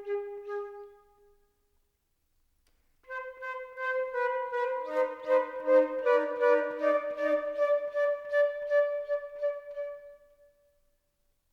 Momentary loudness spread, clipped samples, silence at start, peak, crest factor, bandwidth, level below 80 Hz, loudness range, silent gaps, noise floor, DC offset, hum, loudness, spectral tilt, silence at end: 14 LU; under 0.1%; 0 s; -12 dBFS; 18 dB; 6.8 kHz; -72 dBFS; 15 LU; none; -75 dBFS; under 0.1%; none; -30 LUFS; -4 dB/octave; 1.35 s